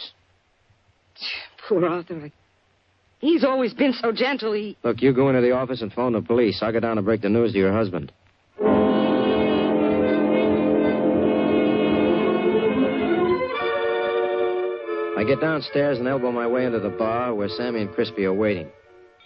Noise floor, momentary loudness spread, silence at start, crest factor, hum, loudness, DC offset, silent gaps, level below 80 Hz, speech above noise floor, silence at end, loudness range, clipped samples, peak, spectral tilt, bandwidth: -63 dBFS; 7 LU; 0 s; 16 dB; none; -22 LUFS; under 0.1%; none; -56 dBFS; 42 dB; 0.55 s; 4 LU; under 0.1%; -6 dBFS; -9 dB/octave; 6 kHz